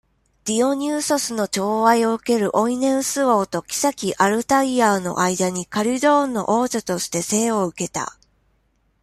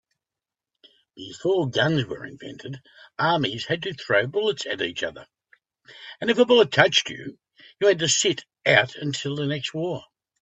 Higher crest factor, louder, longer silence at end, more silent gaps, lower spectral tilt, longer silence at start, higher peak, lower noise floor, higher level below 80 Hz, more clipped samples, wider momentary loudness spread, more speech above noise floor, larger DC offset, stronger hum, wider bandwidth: second, 18 dB vs 24 dB; about the same, -20 LUFS vs -22 LUFS; first, 0.9 s vs 0.4 s; neither; about the same, -4 dB/octave vs -3.5 dB/octave; second, 0.45 s vs 1.15 s; about the same, -2 dBFS vs 0 dBFS; second, -64 dBFS vs -90 dBFS; about the same, -60 dBFS vs -64 dBFS; neither; second, 7 LU vs 20 LU; second, 45 dB vs 66 dB; neither; neither; first, 15 kHz vs 8.4 kHz